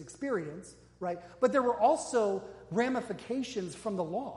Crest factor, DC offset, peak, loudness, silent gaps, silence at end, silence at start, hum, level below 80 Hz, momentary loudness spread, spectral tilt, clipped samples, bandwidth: 18 dB; under 0.1%; -14 dBFS; -32 LUFS; none; 0 s; 0 s; none; -66 dBFS; 11 LU; -5 dB/octave; under 0.1%; 11.5 kHz